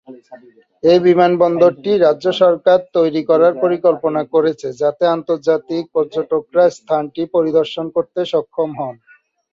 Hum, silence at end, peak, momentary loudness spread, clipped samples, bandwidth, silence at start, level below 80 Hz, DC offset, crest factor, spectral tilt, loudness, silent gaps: none; 0.6 s; -2 dBFS; 8 LU; under 0.1%; 7.6 kHz; 0.1 s; -62 dBFS; under 0.1%; 14 dB; -6.5 dB/octave; -15 LUFS; none